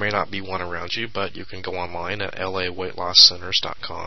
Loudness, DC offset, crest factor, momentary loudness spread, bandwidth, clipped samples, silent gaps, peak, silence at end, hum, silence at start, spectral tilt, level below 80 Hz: -20 LUFS; 2%; 24 dB; 18 LU; 11 kHz; under 0.1%; none; 0 dBFS; 0 s; none; 0 s; -2 dB/octave; -50 dBFS